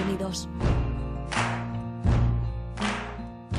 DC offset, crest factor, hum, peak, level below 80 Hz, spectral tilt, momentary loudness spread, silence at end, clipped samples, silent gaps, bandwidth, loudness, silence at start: under 0.1%; 16 dB; none; -10 dBFS; -32 dBFS; -6 dB/octave; 8 LU; 0 s; under 0.1%; none; 12.5 kHz; -29 LUFS; 0 s